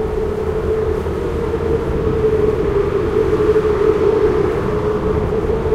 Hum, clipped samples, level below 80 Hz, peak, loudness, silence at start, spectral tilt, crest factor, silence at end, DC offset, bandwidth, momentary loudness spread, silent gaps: none; under 0.1%; -26 dBFS; -2 dBFS; -17 LUFS; 0 s; -8 dB/octave; 14 dB; 0 s; under 0.1%; 11 kHz; 6 LU; none